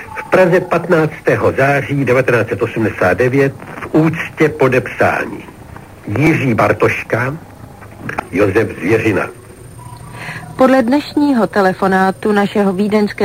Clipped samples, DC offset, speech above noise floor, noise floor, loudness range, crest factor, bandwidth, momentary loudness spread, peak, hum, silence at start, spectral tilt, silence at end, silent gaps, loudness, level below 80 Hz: under 0.1%; under 0.1%; 21 dB; -34 dBFS; 3 LU; 14 dB; 16 kHz; 15 LU; 0 dBFS; none; 0 s; -7 dB/octave; 0 s; none; -14 LUFS; -44 dBFS